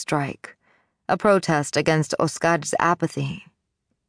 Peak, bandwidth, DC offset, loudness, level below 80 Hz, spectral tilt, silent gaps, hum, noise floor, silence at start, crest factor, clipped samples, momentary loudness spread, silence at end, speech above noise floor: -4 dBFS; 10.5 kHz; under 0.1%; -22 LUFS; -60 dBFS; -5 dB/octave; none; none; -76 dBFS; 0 s; 18 dB; under 0.1%; 12 LU; 0.65 s; 54 dB